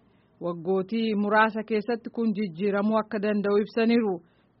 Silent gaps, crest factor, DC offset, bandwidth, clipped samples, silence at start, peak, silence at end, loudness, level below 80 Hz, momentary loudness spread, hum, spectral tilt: none; 18 dB; under 0.1%; 5.8 kHz; under 0.1%; 0.4 s; -8 dBFS; 0.4 s; -26 LUFS; -70 dBFS; 9 LU; none; -5 dB/octave